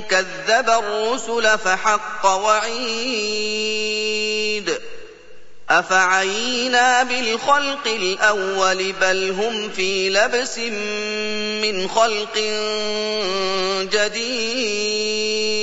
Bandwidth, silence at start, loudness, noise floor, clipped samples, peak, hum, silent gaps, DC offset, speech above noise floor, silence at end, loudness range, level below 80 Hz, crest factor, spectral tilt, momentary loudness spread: 8 kHz; 0 s; -19 LUFS; -41 dBFS; under 0.1%; -2 dBFS; 50 Hz at -65 dBFS; none; 2%; 21 dB; 0 s; 3 LU; -62 dBFS; 18 dB; -1.5 dB/octave; 6 LU